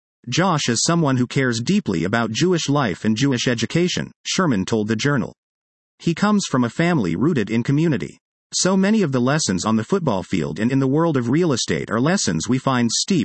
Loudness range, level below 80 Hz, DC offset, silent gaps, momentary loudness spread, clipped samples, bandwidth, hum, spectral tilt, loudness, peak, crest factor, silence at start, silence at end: 2 LU; -56 dBFS; under 0.1%; 4.16-4.24 s, 5.38-5.98 s, 8.21-8.50 s; 4 LU; under 0.1%; 8.8 kHz; none; -5 dB/octave; -20 LUFS; -4 dBFS; 16 dB; 0.25 s; 0 s